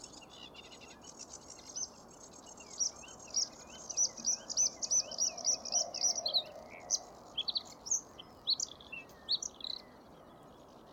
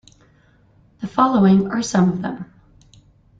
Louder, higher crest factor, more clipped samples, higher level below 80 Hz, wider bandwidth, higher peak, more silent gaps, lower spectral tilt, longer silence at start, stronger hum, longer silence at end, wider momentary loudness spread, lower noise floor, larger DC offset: second, -34 LUFS vs -18 LUFS; about the same, 20 dB vs 18 dB; neither; second, -70 dBFS vs -54 dBFS; first, 19 kHz vs 7.8 kHz; second, -20 dBFS vs -2 dBFS; neither; second, 1 dB/octave vs -6.5 dB/octave; second, 0 s vs 1 s; neither; second, 0 s vs 0.95 s; about the same, 20 LU vs 19 LU; about the same, -56 dBFS vs -55 dBFS; neither